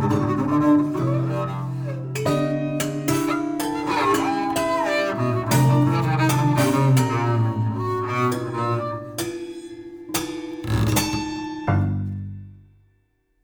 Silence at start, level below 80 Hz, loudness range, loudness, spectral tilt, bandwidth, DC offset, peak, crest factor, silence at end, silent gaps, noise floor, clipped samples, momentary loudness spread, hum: 0 s; -46 dBFS; 6 LU; -22 LUFS; -6 dB/octave; over 20 kHz; under 0.1%; -6 dBFS; 16 dB; 0.9 s; none; -66 dBFS; under 0.1%; 11 LU; none